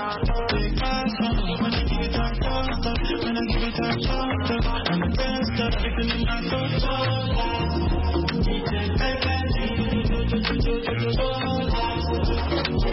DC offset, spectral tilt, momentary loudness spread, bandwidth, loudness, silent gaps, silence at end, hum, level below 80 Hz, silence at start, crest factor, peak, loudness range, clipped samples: under 0.1%; -9 dB/octave; 2 LU; 5.8 kHz; -25 LUFS; none; 0 s; none; -28 dBFS; 0 s; 14 dB; -8 dBFS; 1 LU; under 0.1%